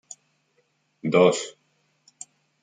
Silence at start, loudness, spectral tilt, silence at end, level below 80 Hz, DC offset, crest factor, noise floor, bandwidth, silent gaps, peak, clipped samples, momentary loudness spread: 1.05 s; -22 LUFS; -5 dB/octave; 1.15 s; -74 dBFS; under 0.1%; 22 dB; -69 dBFS; 9.6 kHz; none; -4 dBFS; under 0.1%; 26 LU